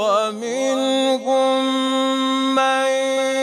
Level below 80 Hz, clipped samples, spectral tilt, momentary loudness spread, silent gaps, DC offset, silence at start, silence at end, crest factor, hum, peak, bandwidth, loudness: -74 dBFS; under 0.1%; -2 dB/octave; 3 LU; none; under 0.1%; 0 s; 0 s; 12 dB; none; -6 dBFS; 14 kHz; -19 LUFS